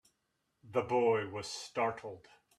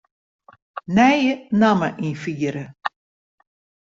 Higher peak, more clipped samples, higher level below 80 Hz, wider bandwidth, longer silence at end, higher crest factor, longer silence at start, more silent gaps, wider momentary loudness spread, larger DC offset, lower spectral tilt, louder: second, -18 dBFS vs -2 dBFS; neither; second, -76 dBFS vs -58 dBFS; first, 12.5 kHz vs 7.6 kHz; second, 0.4 s vs 0.9 s; about the same, 18 dB vs 20 dB; about the same, 0.65 s vs 0.75 s; neither; about the same, 17 LU vs 15 LU; neither; second, -4.5 dB/octave vs -6.5 dB/octave; second, -34 LUFS vs -20 LUFS